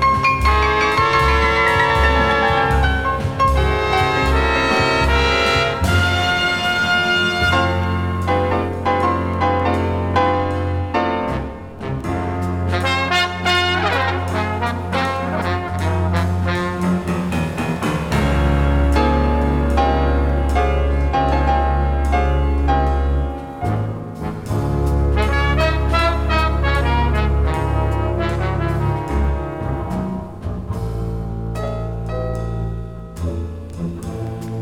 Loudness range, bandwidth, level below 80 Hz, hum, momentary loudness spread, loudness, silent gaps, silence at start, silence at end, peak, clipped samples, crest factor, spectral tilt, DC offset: 7 LU; 14 kHz; -24 dBFS; none; 10 LU; -18 LUFS; none; 0 s; 0 s; -2 dBFS; under 0.1%; 16 dB; -6 dB/octave; under 0.1%